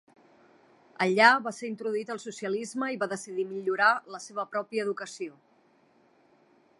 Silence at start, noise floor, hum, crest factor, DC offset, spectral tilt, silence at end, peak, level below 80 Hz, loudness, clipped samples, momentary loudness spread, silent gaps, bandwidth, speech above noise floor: 1 s; -64 dBFS; none; 26 dB; under 0.1%; -3.5 dB/octave; 1.5 s; -4 dBFS; -86 dBFS; -28 LUFS; under 0.1%; 16 LU; none; 11.5 kHz; 36 dB